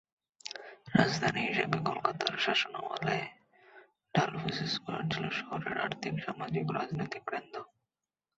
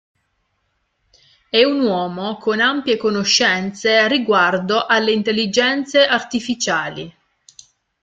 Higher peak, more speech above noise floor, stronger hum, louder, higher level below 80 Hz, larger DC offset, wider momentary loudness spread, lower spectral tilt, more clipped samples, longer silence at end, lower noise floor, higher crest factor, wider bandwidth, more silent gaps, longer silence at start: second, -10 dBFS vs -2 dBFS; first, over 57 dB vs 52 dB; neither; second, -33 LUFS vs -17 LUFS; second, -68 dBFS vs -60 dBFS; neither; first, 14 LU vs 8 LU; about the same, -3.5 dB/octave vs -3 dB/octave; neither; second, 0.7 s vs 0.95 s; first, under -90 dBFS vs -69 dBFS; first, 24 dB vs 16 dB; second, 8 kHz vs 9.4 kHz; neither; second, 0.45 s vs 1.55 s